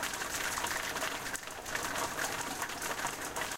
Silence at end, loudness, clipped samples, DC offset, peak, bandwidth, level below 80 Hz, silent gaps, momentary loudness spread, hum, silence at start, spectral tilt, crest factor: 0 s; -35 LUFS; under 0.1%; under 0.1%; -16 dBFS; 17 kHz; -58 dBFS; none; 4 LU; none; 0 s; -1 dB/octave; 20 dB